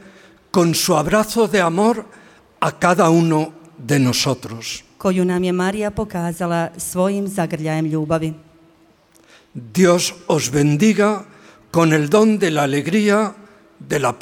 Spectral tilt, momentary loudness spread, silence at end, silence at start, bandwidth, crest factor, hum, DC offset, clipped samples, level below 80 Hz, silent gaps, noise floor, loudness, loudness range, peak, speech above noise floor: -5 dB/octave; 11 LU; 0.05 s; 0.05 s; 17 kHz; 16 dB; none; under 0.1%; under 0.1%; -50 dBFS; none; -53 dBFS; -18 LUFS; 5 LU; -2 dBFS; 36 dB